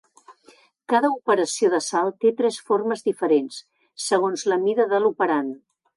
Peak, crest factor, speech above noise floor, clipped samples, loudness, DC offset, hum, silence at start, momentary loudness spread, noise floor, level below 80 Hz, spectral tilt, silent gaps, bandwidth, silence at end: -8 dBFS; 16 dB; 34 dB; under 0.1%; -22 LUFS; under 0.1%; none; 0.3 s; 6 LU; -55 dBFS; -78 dBFS; -3.5 dB/octave; none; 11.5 kHz; 0.4 s